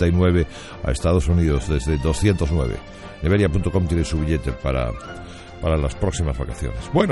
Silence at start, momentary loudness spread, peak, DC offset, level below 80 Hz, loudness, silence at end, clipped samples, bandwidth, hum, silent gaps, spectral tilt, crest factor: 0 s; 11 LU; -4 dBFS; under 0.1%; -28 dBFS; -22 LUFS; 0 s; under 0.1%; 11.5 kHz; none; none; -7 dB/octave; 16 dB